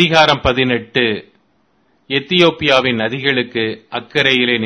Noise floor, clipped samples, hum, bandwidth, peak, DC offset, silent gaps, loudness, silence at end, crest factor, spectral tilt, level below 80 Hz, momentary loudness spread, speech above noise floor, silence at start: -59 dBFS; 0.1%; none; 11 kHz; 0 dBFS; under 0.1%; none; -14 LUFS; 0 s; 16 dB; -5 dB/octave; -40 dBFS; 9 LU; 44 dB; 0 s